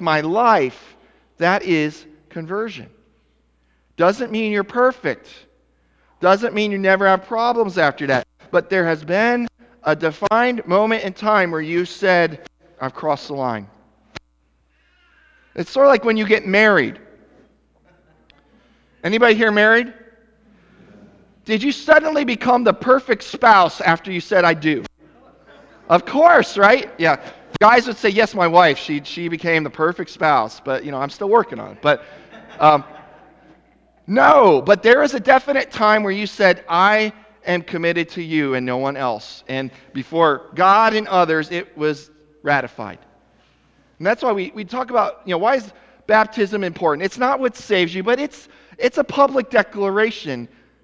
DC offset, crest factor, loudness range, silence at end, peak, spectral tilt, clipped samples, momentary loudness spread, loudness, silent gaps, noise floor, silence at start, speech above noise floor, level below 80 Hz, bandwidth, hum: under 0.1%; 18 dB; 7 LU; 0.4 s; 0 dBFS; -5.5 dB/octave; under 0.1%; 13 LU; -17 LUFS; none; -62 dBFS; 0 s; 45 dB; -58 dBFS; 8 kHz; none